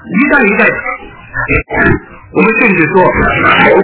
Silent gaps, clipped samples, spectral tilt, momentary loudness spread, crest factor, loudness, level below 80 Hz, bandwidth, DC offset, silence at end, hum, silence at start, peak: none; 1%; -9.5 dB/octave; 12 LU; 10 dB; -9 LUFS; -28 dBFS; 4 kHz; under 0.1%; 0 s; none; 0.05 s; 0 dBFS